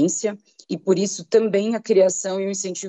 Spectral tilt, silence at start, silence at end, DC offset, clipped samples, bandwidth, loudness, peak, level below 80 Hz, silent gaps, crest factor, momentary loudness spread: -4.5 dB/octave; 0 s; 0 s; under 0.1%; under 0.1%; 8.6 kHz; -21 LUFS; -6 dBFS; -76 dBFS; none; 16 dB; 10 LU